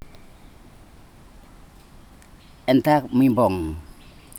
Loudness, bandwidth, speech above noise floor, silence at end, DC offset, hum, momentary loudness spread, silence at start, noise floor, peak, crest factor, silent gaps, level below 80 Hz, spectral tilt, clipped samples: -20 LUFS; 17.5 kHz; 29 dB; 0 s; under 0.1%; none; 14 LU; 0.05 s; -48 dBFS; -6 dBFS; 18 dB; none; -46 dBFS; -7 dB/octave; under 0.1%